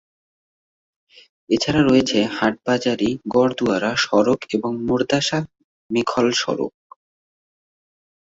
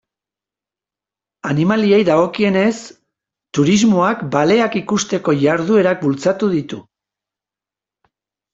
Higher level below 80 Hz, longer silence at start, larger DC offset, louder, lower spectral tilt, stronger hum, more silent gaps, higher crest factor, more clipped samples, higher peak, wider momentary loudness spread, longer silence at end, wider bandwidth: about the same, -52 dBFS vs -56 dBFS; about the same, 1.5 s vs 1.45 s; neither; second, -20 LUFS vs -15 LUFS; about the same, -4.5 dB/octave vs -5.5 dB/octave; second, none vs 50 Hz at -40 dBFS; first, 5.64-5.89 s vs none; about the same, 18 dB vs 16 dB; neither; about the same, -2 dBFS vs -2 dBFS; about the same, 8 LU vs 9 LU; about the same, 1.6 s vs 1.7 s; about the same, 8 kHz vs 7.8 kHz